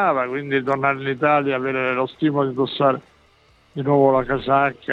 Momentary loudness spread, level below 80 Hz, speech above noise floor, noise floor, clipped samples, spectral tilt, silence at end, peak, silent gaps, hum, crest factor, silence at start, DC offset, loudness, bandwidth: 5 LU; -52 dBFS; 36 dB; -56 dBFS; under 0.1%; -8.5 dB/octave; 0 s; -4 dBFS; none; none; 16 dB; 0 s; under 0.1%; -20 LUFS; 6 kHz